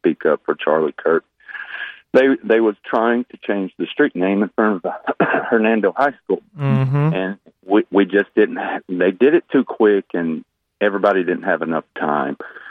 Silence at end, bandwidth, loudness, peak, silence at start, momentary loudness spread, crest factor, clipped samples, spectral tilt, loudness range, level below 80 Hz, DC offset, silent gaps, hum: 0 s; 5.6 kHz; -18 LUFS; -2 dBFS; 0.05 s; 9 LU; 14 dB; under 0.1%; -9 dB/octave; 2 LU; -66 dBFS; under 0.1%; none; none